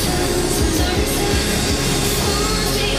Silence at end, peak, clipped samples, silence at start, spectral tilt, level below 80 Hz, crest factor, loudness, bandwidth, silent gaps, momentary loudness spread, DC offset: 0 s; -4 dBFS; under 0.1%; 0 s; -3.5 dB/octave; -26 dBFS; 14 dB; -18 LUFS; 15.5 kHz; none; 1 LU; under 0.1%